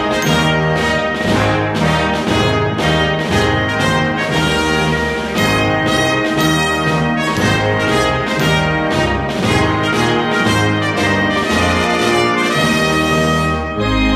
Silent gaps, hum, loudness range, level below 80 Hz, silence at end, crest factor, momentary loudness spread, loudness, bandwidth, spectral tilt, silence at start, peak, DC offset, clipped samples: none; none; 1 LU; -30 dBFS; 0 s; 14 dB; 2 LU; -14 LUFS; 15.5 kHz; -5 dB/octave; 0 s; 0 dBFS; under 0.1%; under 0.1%